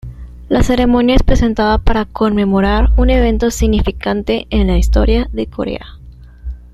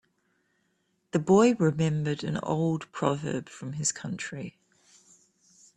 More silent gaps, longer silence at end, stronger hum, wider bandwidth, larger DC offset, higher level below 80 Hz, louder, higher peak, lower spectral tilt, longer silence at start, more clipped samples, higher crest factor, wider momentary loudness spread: neither; second, 0.15 s vs 1.25 s; neither; first, 12.5 kHz vs 11 kHz; neither; first, -18 dBFS vs -66 dBFS; first, -14 LUFS vs -27 LUFS; first, 0 dBFS vs -8 dBFS; about the same, -6.5 dB/octave vs -5.5 dB/octave; second, 0.05 s vs 1.15 s; neither; second, 12 dB vs 20 dB; second, 11 LU vs 15 LU